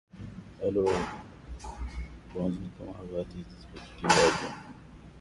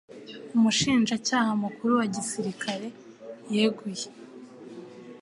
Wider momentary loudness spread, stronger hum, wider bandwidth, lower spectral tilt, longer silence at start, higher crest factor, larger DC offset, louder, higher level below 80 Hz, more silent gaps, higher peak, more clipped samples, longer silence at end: about the same, 23 LU vs 22 LU; neither; about the same, 11.5 kHz vs 11.5 kHz; about the same, -4 dB/octave vs -4 dB/octave; about the same, 0.15 s vs 0.1 s; first, 24 dB vs 18 dB; neither; second, -30 LUFS vs -26 LUFS; first, -46 dBFS vs -64 dBFS; neither; about the same, -8 dBFS vs -10 dBFS; neither; about the same, 0 s vs 0 s